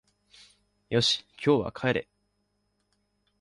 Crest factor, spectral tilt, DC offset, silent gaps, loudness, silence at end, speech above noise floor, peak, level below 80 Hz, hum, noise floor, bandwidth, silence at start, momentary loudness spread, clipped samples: 20 dB; -4.5 dB/octave; under 0.1%; none; -27 LUFS; 1.4 s; 49 dB; -10 dBFS; -60 dBFS; 50 Hz at -55 dBFS; -75 dBFS; 11.5 kHz; 0.9 s; 5 LU; under 0.1%